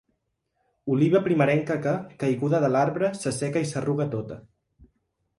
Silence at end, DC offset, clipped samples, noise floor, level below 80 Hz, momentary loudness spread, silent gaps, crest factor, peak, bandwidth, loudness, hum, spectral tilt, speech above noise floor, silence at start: 1 s; under 0.1%; under 0.1%; -76 dBFS; -62 dBFS; 9 LU; none; 16 dB; -8 dBFS; 11.5 kHz; -25 LUFS; none; -7 dB/octave; 52 dB; 0.85 s